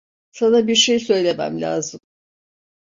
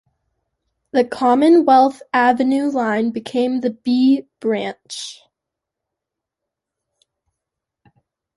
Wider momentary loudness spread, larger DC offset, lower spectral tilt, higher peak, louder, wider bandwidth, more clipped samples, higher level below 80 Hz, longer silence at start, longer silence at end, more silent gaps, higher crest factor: second, 10 LU vs 14 LU; neither; second, -3 dB/octave vs -5 dB/octave; about the same, -4 dBFS vs -2 dBFS; about the same, -18 LUFS vs -17 LUFS; second, 7.8 kHz vs 11.5 kHz; neither; about the same, -62 dBFS vs -66 dBFS; second, 0.35 s vs 0.95 s; second, 0.9 s vs 3.25 s; neither; about the same, 16 dB vs 18 dB